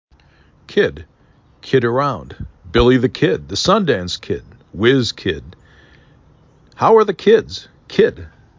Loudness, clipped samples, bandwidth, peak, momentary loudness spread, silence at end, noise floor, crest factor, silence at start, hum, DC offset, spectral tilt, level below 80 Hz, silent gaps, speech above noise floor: -16 LUFS; under 0.1%; 7.6 kHz; -2 dBFS; 17 LU; 0.3 s; -52 dBFS; 16 dB; 0.7 s; none; under 0.1%; -5.5 dB/octave; -38 dBFS; none; 36 dB